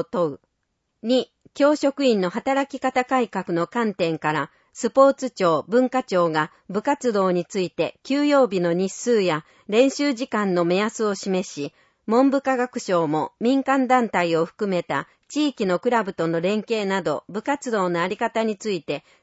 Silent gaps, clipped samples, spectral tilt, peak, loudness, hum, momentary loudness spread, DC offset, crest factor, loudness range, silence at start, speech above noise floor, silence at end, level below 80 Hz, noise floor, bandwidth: none; under 0.1%; -5.5 dB/octave; -4 dBFS; -22 LUFS; none; 8 LU; under 0.1%; 18 dB; 2 LU; 0 s; 53 dB; 0.25 s; -68 dBFS; -75 dBFS; 8 kHz